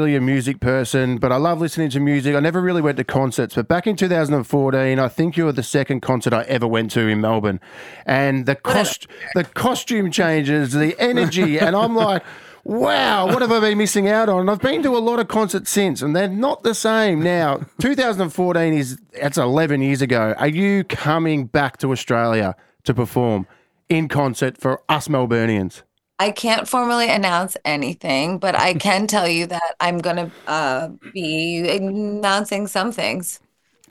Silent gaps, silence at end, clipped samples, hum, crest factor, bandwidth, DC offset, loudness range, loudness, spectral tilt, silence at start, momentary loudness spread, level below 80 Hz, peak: none; 0.55 s; under 0.1%; none; 18 dB; 18.5 kHz; under 0.1%; 3 LU; -19 LUFS; -5 dB/octave; 0 s; 6 LU; -54 dBFS; 0 dBFS